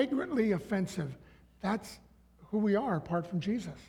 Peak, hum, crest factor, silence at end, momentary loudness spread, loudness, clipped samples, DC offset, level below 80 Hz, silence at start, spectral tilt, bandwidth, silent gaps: -16 dBFS; none; 18 dB; 0.05 s; 12 LU; -33 LUFS; under 0.1%; under 0.1%; -62 dBFS; 0 s; -7 dB/octave; 14 kHz; none